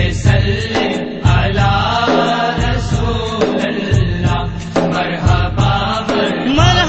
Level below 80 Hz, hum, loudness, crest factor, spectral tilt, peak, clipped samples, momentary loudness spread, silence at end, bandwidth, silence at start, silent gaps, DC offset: -24 dBFS; none; -15 LUFS; 14 dB; -6 dB/octave; 0 dBFS; under 0.1%; 4 LU; 0 s; 8.6 kHz; 0 s; none; under 0.1%